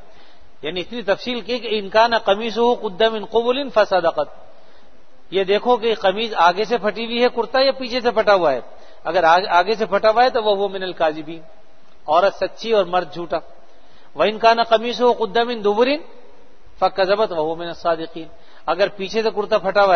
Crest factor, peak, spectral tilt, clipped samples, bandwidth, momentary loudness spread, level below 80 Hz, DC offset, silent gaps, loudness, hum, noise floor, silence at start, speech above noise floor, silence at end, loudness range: 18 dB; 0 dBFS; -4.5 dB/octave; under 0.1%; 6.6 kHz; 11 LU; -52 dBFS; 2%; none; -19 LUFS; none; -52 dBFS; 0.65 s; 34 dB; 0 s; 4 LU